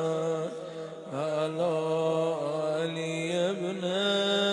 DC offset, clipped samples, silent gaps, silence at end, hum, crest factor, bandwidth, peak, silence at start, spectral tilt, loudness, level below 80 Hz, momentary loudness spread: under 0.1%; under 0.1%; none; 0 s; none; 14 dB; 11 kHz; -14 dBFS; 0 s; -5 dB/octave; -30 LUFS; -80 dBFS; 10 LU